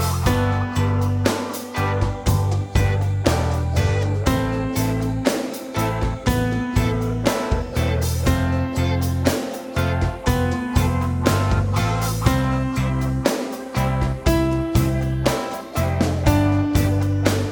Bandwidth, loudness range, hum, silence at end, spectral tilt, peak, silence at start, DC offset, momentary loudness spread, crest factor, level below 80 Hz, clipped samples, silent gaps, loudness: over 20 kHz; 1 LU; none; 0 s; -6 dB/octave; -2 dBFS; 0 s; under 0.1%; 4 LU; 18 dB; -30 dBFS; under 0.1%; none; -21 LUFS